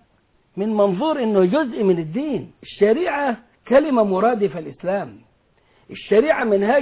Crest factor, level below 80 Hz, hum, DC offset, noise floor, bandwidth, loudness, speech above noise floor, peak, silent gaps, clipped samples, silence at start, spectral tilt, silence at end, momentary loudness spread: 14 dB; -58 dBFS; none; under 0.1%; -61 dBFS; 4 kHz; -19 LUFS; 42 dB; -6 dBFS; none; under 0.1%; 0.55 s; -10.5 dB/octave; 0 s; 13 LU